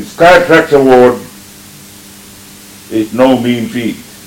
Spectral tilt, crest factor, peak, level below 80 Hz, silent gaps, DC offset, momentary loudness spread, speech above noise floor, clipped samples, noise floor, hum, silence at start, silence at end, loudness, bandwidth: -5 dB/octave; 10 dB; 0 dBFS; -40 dBFS; none; under 0.1%; 14 LU; 26 dB; 4%; -34 dBFS; none; 0 s; 0.25 s; -9 LUFS; 17.5 kHz